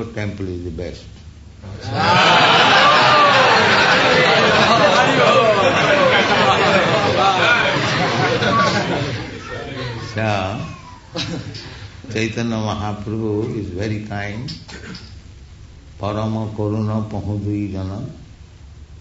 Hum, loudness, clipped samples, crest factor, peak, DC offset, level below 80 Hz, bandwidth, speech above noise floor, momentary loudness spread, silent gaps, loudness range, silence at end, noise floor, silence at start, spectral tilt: none; -15 LUFS; under 0.1%; 16 dB; -2 dBFS; under 0.1%; -44 dBFS; 8 kHz; 17 dB; 19 LU; none; 14 LU; 0 s; -40 dBFS; 0 s; -4.5 dB/octave